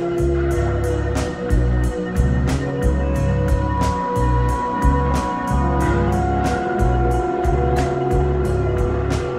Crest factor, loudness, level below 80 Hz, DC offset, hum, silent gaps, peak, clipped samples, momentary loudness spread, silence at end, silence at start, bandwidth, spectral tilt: 14 dB; -20 LUFS; -22 dBFS; under 0.1%; none; none; -4 dBFS; under 0.1%; 3 LU; 0 s; 0 s; 13 kHz; -7.5 dB/octave